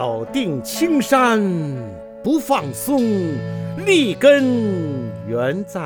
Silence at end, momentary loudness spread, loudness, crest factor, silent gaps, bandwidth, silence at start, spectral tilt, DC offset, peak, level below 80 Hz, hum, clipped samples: 0 s; 13 LU; -18 LUFS; 18 dB; none; over 20 kHz; 0 s; -5.5 dB/octave; under 0.1%; 0 dBFS; -56 dBFS; none; under 0.1%